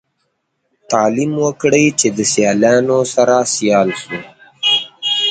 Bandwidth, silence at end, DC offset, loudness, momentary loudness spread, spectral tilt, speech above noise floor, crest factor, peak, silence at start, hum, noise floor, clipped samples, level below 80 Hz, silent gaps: 9.6 kHz; 0 s; under 0.1%; -14 LUFS; 7 LU; -3 dB/octave; 54 dB; 16 dB; 0 dBFS; 0.9 s; none; -68 dBFS; under 0.1%; -58 dBFS; none